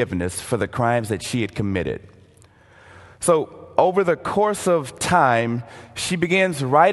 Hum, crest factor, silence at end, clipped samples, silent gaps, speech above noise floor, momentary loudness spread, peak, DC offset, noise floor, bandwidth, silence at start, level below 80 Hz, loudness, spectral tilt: none; 20 dB; 0 s; under 0.1%; none; 31 dB; 8 LU; 0 dBFS; under 0.1%; -51 dBFS; 12.5 kHz; 0 s; -46 dBFS; -21 LUFS; -5 dB/octave